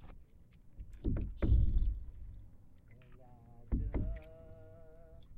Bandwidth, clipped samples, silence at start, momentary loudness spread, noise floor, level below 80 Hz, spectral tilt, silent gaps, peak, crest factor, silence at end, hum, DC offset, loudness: 3.8 kHz; under 0.1%; 0 s; 27 LU; -58 dBFS; -38 dBFS; -10.5 dB/octave; none; -20 dBFS; 18 dB; 0 s; none; under 0.1%; -38 LUFS